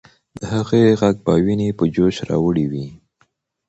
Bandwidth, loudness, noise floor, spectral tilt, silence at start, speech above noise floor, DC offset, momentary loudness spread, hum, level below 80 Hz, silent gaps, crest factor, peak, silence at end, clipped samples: 8.2 kHz; -18 LUFS; -63 dBFS; -7.5 dB/octave; 0.4 s; 46 dB; under 0.1%; 11 LU; none; -44 dBFS; none; 16 dB; -2 dBFS; 0.75 s; under 0.1%